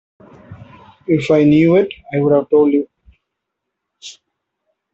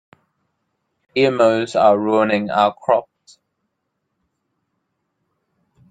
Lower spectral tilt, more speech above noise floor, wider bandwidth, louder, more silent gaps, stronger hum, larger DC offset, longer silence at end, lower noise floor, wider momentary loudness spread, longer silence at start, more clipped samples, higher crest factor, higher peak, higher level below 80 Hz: first, -8 dB/octave vs -6 dB/octave; first, 65 dB vs 59 dB; second, 7.8 kHz vs 9.2 kHz; first, -14 LUFS vs -17 LUFS; neither; neither; neither; second, 0.85 s vs 2.9 s; about the same, -78 dBFS vs -75 dBFS; first, 25 LU vs 5 LU; second, 0.5 s vs 1.15 s; neither; about the same, 16 dB vs 20 dB; about the same, -2 dBFS vs -2 dBFS; first, -52 dBFS vs -64 dBFS